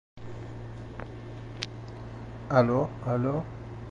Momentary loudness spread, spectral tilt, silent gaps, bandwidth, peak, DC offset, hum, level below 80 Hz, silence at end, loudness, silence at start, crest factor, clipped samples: 17 LU; -7.5 dB/octave; none; 8.6 kHz; -8 dBFS; under 0.1%; none; -50 dBFS; 0 s; -30 LUFS; 0.15 s; 24 dB; under 0.1%